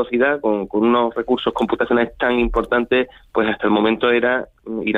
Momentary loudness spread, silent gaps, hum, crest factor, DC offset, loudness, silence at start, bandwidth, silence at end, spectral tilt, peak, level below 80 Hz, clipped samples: 5 LU; none; none; 14 dB; under 0.1%; -18 LUFS; 0 s; 7 kHz; 0 s; -7 dB/octave; -4 dBFS; -38 dBFS; under 0.1%